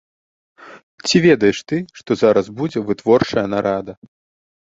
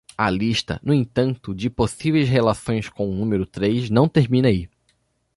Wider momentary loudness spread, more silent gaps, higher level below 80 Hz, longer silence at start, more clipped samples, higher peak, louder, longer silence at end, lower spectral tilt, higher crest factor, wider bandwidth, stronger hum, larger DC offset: first, 11 LU vs 8 LU; first, 0.83-0.98 s vs none; second, -52 dBFS vs -44 dBFS; first, 0.6 s vs 0.2 s; neither; first, 0 dBFS vs -4 dBFS; first, -17 LUFS vs -21 LUFS; about the same, 0.75 s vs 0.7 s; second, -5.5 dB/octave vs -7 dB/octave; about the same, 18 dB vs 16 dB; second, 8 kHz vs 11.5 kHz; neither; neither